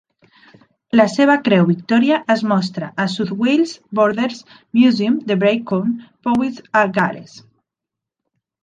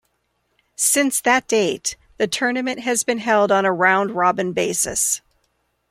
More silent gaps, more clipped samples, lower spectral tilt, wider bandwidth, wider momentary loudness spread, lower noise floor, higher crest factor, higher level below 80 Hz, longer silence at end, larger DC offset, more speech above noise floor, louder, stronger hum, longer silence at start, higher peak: neither; neither; first, -6.5 dB/octave vs -2.5 dB/octave; second, 9.2 kHz vs 16 kHz; about the same, 8 LU vs 8 LU; first, -84 dBFS vs -69 dBFS; about the same, 16 dB vs 18 dB; second, -64 dBFS vs -58 dBFS; first, 1.4 s vs 0.75 s; neither; first, 68 dB vs 50 dB; about the same, -17 LUFS vs -19 LUFS; neither; first, 0.95 s vs 0.8 s; about the same, -2 dBFS vs -2 dBFS